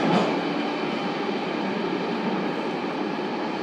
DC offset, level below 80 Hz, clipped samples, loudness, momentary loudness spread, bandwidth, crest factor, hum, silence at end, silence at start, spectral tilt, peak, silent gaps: under 0.1%; -72 dBFS; under 0.1%; -26 LUFS; 4 LU; 10.5 kHz; 16 dB; none; 0 s; 0 s; -6 dB/octave; -10 dBFS; none